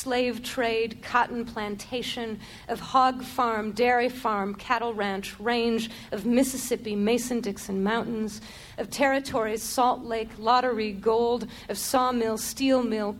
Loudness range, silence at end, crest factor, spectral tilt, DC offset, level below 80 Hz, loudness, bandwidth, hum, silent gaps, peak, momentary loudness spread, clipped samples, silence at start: 2 LU; 0 s; 18 dB; -4 dB/octave; under 0.1%; -54 dBFS; -27 LUFS; 17 kHz; none; none; -8 dBFS; 10 LU; under 0.1%; 0 s